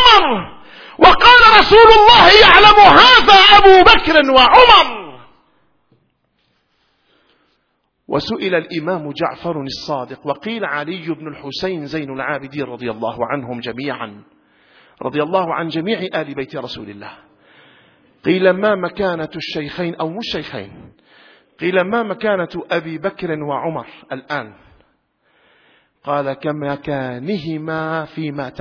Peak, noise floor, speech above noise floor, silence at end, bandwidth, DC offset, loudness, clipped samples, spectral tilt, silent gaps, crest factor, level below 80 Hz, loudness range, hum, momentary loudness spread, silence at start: 0 dBFS; -66 dBFS; 53 dB; 0.1 s; 5.4 kHz; under 0.1%; -11 LUFS; 0.3%; -4.5 dB/octave; none; 14 dB; -36 dBFS; 20 LU; none; 21 LU; 0 s